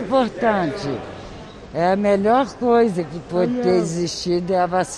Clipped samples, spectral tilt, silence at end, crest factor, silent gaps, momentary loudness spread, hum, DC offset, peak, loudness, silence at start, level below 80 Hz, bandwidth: under 0.1%; -5.5 dB/octave; 0 s; 14 dB; none; 13 LU; none; under 0.1%; -6 dBFS; -20 LUFS; 0 s; -48 dBFS; 11.5 kHz